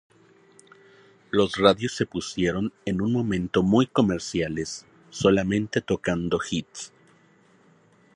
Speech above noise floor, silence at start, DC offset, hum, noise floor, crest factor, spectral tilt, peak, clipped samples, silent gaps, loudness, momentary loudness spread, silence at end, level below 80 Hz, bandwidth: 35 dB; 1.35 s; under 0.1%; none; -58 dBFS; 22 dB; -5.5 dB/octave; -4 dBFS; under 0.1%; none; -24 LUFS; 12 LU; 1.3 s; -50 dBFS; 11 kHz